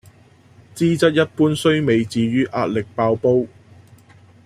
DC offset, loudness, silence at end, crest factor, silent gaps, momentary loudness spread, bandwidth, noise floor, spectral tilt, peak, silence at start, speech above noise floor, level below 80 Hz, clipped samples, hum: under 0.1%; -18 LUFS; 1 s; 18 dB; none; 5 LU; 14.5 kHz; -50 dBFS; -6.5 dB/octave; -2 dBFS; 0.75 s; 32 dB; -56 dBFS; under 0.1%; none